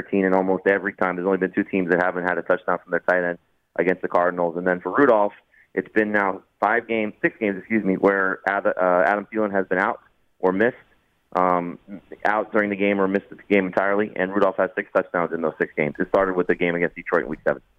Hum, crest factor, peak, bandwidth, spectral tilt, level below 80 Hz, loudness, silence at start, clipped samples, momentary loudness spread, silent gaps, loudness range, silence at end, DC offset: none; 18 dB; -4 dBFS; 6.8 kHz; -8.5 dB/octave; -58 dBFS; -22 LUFS; 0 s; under 0.1%; 6 LU; none; 2 LU; 0.2 s; under 0.1%